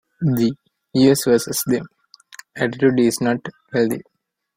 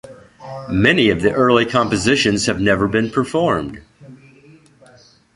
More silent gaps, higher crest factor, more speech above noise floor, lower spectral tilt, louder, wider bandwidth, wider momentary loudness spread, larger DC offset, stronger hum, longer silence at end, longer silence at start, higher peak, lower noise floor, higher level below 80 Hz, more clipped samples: neither; about the same, 18 dB vs 18 dB; second, 27 dB vs 33 dB; about the same, -5.5 dB/octave vs -5 dB/octave; second, -19 LUFS vs -16 LUFS; first, 16.5 kHz vs 11.5 kHz; about the same, 10 LU vs 9 LU; neither; neither; second, 0.55 s vs 1.2 s; first, 0.2 s vs 0.05 s; about the same, -2 dBFS vs 0 dBFS; second, -44 dBFS vs -49 dBFS; second, -58 dBFS vs -42 dBFS; neither